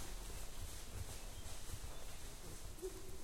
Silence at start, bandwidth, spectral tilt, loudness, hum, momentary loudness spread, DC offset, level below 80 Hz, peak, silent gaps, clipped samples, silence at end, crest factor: 0 s; 16.5 kHz; -3.5 dB/octave; -51 LUFS; none; 3 LU; under 0.1%; -52 dBFS; -34 dBFS; none; under 0.1%; 0 s; 12 dB